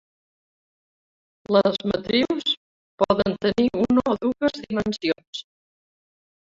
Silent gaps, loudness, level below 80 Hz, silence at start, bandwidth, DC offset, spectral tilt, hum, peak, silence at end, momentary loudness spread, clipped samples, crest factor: 2.57-2.98 s, 5.28-5.33 s; -23 LUFS; -54 dBFS; 1.5 s; 7.6 kHz; under 0.1%; -6 dB/octave; none; -4 dBFS; 1.15 s; 7 LU; under 0.1%; 20 dB